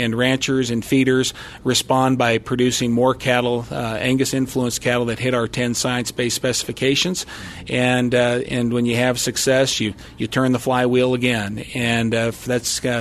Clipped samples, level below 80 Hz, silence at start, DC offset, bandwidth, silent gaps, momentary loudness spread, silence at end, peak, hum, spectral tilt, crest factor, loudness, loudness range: under 0.1%; -46 dBFS; 0 s; under 0.1%; 13.5 kHz; none; 6 LU; 0 s; -2 dBFS; none; -4 dB/octave; 18 dB; -19 LUFS; 2 LU